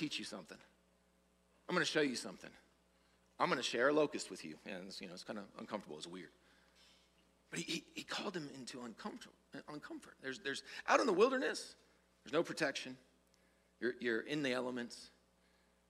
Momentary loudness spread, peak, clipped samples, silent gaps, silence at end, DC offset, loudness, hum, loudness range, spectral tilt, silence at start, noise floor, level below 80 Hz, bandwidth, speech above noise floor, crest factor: 20 LU; -16 dBFS; under 0.1%; none; 0.8 s; under 0.1%; -40 LUFS; none; 9 LU; -3.5 dB/octave; 0 s; -74 dBFS; -80 dBFS; 15 kHz; 34 dB; 26 dB